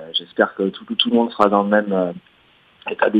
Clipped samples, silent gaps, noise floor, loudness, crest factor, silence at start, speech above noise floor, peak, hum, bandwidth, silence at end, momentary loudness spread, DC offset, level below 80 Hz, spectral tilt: under 0.1%; none; -55 dBFS; -19 LUFS; 20 dB; 0 s; 37 dB; 0 dBFS; none; 8.2 kHz; 0 s; 12 LU; under 0.1%; -62 dBFS; -7 dB/octave